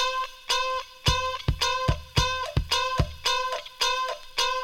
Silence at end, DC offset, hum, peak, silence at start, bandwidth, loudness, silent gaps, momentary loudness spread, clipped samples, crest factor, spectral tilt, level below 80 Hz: 0 s; under 0.1%; none; -8 dBFS; 0 s; 18 kHz; -26 LUFS; none; 4 LU; under 0.1%; 18 dB; -3 dB/octave; -36 dBFS